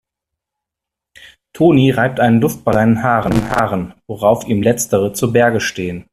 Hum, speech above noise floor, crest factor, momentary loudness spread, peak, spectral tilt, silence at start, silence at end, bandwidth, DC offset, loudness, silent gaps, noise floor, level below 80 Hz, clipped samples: none; 69 dB; 16 dB; 7 LU; 0 dBFS; -6 dB/octave; 1.55 s; 0.1 s; 15 kHz; under 0.1%; -15 LUFS; none; -83 dBFS; -42 dBFS; under 0.1%